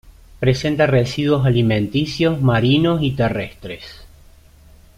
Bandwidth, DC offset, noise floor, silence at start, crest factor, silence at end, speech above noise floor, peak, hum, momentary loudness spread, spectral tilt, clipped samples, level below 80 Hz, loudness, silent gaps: 11.5 kHz; under 0.1%; -46 dBFS; 0.4 s; 14 dB; 0.9 s; 29 dB; -4 dBFS; none; 15 LU; -7 dB/octave; under 0.1%; -40 dBFS; -17 LUFS; none